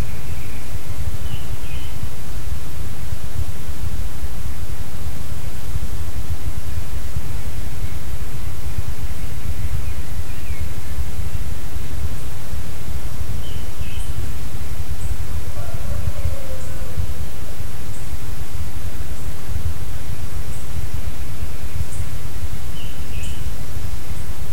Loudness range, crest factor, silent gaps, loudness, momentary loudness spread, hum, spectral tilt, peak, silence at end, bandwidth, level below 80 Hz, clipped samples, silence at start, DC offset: 2 LU; 16 dB; none; -30 LUFS; 3 LU; none; -5 dB/octave; -4 dBFS; 0 s; 16.5 kHz; -30 dBFS; under 0.1%; 0 s; 30%